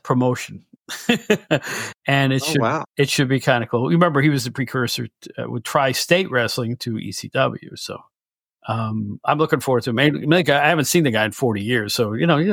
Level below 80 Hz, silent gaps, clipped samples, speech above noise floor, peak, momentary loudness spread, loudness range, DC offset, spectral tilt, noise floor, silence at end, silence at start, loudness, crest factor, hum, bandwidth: -62 dBFS; none; under 0.1%; over 70 dB; -2 dBFS; 12 LU; 5 LU; under 0.1%; -5 dB/octave; under -90 dBFS; 0 s; 0.05 s; -20 LUFS; 18 dB; none; 19.5 kHz